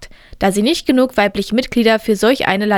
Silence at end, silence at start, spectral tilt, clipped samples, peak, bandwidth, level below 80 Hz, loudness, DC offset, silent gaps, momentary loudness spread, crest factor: 0 s; 0 s; -4.5 dB/octave; under 0.1%; 0 dBFS; 18 kHz; -40 dBFS; -15 LUFS; under 0.1%; none; 4 LU; 14 dB